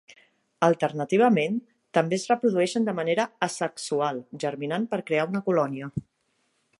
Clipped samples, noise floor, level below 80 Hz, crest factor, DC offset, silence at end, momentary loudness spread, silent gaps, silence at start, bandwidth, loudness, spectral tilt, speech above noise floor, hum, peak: under 0.1%; -72 dBFS; -64 dBFS; 20 dB; under 0.1%; 0.8 s; 9 LU; none; 0.1 s; 11.5 kHz; -26 LUFS; -5.5 dB/octave; 47 dB; none; -6 dBFS